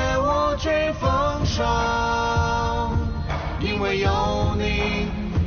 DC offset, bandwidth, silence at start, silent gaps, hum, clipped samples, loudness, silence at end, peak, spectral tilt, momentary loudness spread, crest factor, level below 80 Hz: under 0.1%; 6.6 kHz; 0 s; none; none; under 0.1%; -23 LUFS; 0 s; -8 dBFS; -4.5 dB/octave; 5 LU; 14 dB; -30 dBFS